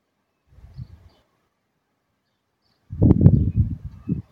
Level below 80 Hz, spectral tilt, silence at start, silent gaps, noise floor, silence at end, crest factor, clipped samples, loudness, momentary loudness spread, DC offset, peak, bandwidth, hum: -34 dBFS; -13 dB/octave; 0.8 s; none; -73 dBFS; 0.1 s; 22 dB; under 0.1%; -19 LUFS; 27 LU; under 0.1%; 0 dBFS; 2.6 kHz; none